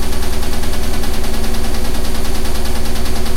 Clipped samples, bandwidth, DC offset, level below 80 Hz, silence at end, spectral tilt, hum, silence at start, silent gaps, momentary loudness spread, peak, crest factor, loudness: under 0.1%; 15 kHz; 0.3%; -18 dBFS; 0 s; -4.5 dB/octave; 60 Hz at -35 dBFS; 0 s; none; 0 LU; -2 dBFS; 8 dB; -21 LUFS